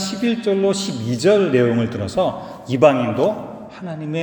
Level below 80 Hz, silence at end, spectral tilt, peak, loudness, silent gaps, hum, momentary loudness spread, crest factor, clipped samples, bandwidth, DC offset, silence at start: -54 dBFS; 0 s; -6 dB/octave; 0 dBFS; -18 LUFS; none; none; 15 LU; 18 dB; under 0.1%; over 20 kHz; under 0.1%; 0 s